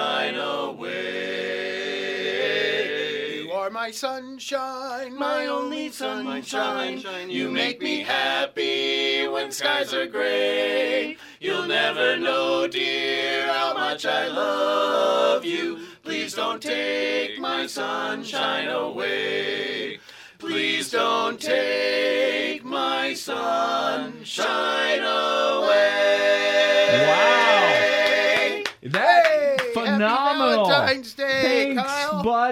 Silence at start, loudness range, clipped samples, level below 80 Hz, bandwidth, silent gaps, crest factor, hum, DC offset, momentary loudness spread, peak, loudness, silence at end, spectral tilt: 0 s; 8 LU; under 0.1%; -68 dBFS; 16 kHz; none; 20 dB; none; under 0.1%; 11 LU; -4 dBFS; -22 LUFS; 0 s; -3 dB/octave